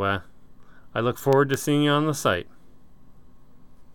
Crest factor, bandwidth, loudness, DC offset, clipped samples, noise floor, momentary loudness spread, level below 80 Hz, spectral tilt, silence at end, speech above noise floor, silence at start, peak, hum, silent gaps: 18 dB; over 20 kHz; -23 LUFS; 0.6%; under 0.1%; -53 dBFS; 9 LU; -56 dBFS; -5.5 dB/octave; 1.5 s; 31 dB; 0 s; -8 dBFS; none; none